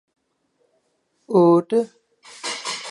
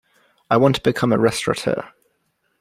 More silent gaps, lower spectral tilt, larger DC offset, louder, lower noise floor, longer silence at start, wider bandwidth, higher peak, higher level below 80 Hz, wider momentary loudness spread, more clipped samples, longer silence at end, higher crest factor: neither; about the same, -5.5 dB/octave vs -5.5 dB/octave; neither; about the same, -20 LUFS vs -19 LUFS; about the same, -69 dBFS vs -69 dBFS; first, 1.3 s vs 0.5 s; second, 11.5 kHz vs 15.5 kHz; about the same, -4 dBFS vs -2 dBFS; second, -78 dBFS vs -54 dBFS; first, 16 LU vs 7 LU; neither; second, 0 s vs 0.75 s; about the same, 20 dB vs 18 dB